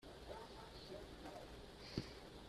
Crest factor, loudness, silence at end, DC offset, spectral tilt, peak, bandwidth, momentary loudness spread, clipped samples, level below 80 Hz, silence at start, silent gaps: 26 dB; -53 LUFS; 0 s; under 0.1%; -5 dB/octave; -28 dBFS; 14 kHz; 6 LU; under 0.1%; -64 dBFS; 0 s; none